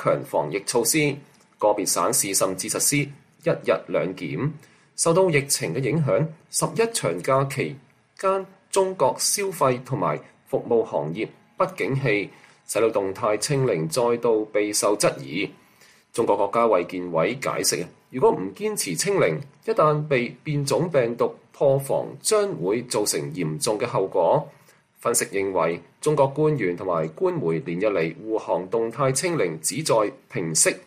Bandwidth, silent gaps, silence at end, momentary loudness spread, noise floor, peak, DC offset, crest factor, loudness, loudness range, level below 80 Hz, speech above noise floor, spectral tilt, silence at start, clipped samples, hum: 15 kHz; none; 0.05 s; 8 LU; -55 dBFS; -6 dBFS; under 0.1%; 18 dB; -23 LUFS; 2 LU; -64 dBFS; 32 dB; -4 dB/octave; 0 s; under 0.1%; none